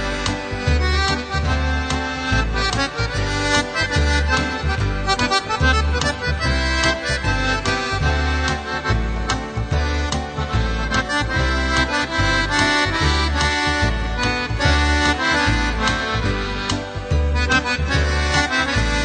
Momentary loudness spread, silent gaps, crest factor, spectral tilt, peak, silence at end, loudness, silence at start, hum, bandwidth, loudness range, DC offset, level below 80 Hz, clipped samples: 5 LU; none; 18 dB; -4 dB/octave; -2 dBFS; 0 s; -19 LUFS; 0 s; none; 9.4 kHz; 3 LU; under 0.1%; -24 dBFS; under 0.1%